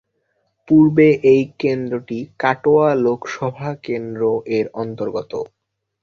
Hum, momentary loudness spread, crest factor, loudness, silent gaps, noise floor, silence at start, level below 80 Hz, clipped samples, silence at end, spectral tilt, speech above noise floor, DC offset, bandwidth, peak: none; 13 LU; 16 dB; -18 LUFS; none; -68 dBFS; 0.7 s; -58 dBFS; under 0.1%; 0.55 s; -8 dB/octave; 51 dB; under 0.1%; 6.8 kHz; -2 dBFS